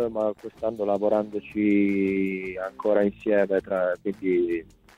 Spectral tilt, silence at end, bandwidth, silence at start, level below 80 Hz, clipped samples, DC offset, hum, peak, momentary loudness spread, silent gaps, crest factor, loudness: -8.5 dB/octave; 0.35 s; 7.6 kHz; 0 s; -58 dBFS; under 0.1%; under 0.1%; none; -10 dBFS; 9 LU; none; 16 dB; -25 LUFS